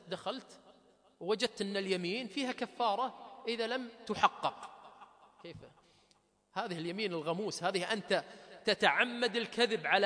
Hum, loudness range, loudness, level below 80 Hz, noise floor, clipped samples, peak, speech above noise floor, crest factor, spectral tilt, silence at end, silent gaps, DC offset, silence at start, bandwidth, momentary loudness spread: none; 6 LU; -34 LUFS; -78 dBFS; -71 dBFS; under 0.1%; -12 dBFS; 37 dB; 24 dB; -3.5 dB/octave; 0 s; none; under 0.1%; 0.05 s; 10.5 kHz; 19 LU